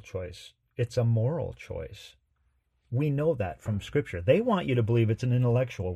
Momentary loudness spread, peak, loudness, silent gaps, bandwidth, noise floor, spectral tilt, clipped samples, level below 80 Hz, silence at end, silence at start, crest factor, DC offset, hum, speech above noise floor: 14 LU; -10 dBFS; -28 LUFS; none; 9 kHz; -72 dBFS; -8 dB/octave; under 0.1%; -54 dBFS; 0 s; 0.05 s; 18 dB; under 0.1%; none; 44 dB